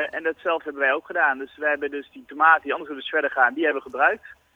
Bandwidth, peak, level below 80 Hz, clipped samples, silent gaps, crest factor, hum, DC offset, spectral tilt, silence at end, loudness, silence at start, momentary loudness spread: 7 kHz; -4 dBFS; -68 dBFS; under 0.1%; none; 20 dB; none; under 0.1%; -4.5 dB/octave; 0.2 s; -22 LUFS; 0 s; 11 LU